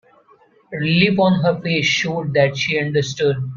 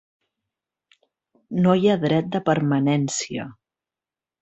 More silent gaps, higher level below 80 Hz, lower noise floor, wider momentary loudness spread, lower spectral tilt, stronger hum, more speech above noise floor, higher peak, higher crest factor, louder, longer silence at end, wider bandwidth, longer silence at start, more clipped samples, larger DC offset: neither; first, -54 dBFS vs -62 dBFS; second, -53 dBFS vs under -90 dBFS; second, 5 LU vs 12 LU; about the same, -5.5 dB/octave vs -6 dB/octave; neither; second, 35 dB vs over 70 dB; about the same, -2 dBFS vs -4 dBFS; about the same, 18 dB vs 20 dB; first, -17 LUFS vs -21 LUFS; second, 0 s vs 0.9 s; second, 7.4 kHz vs 8.2 kHz; second, 0.7 s vs 1.5 s; neither; neither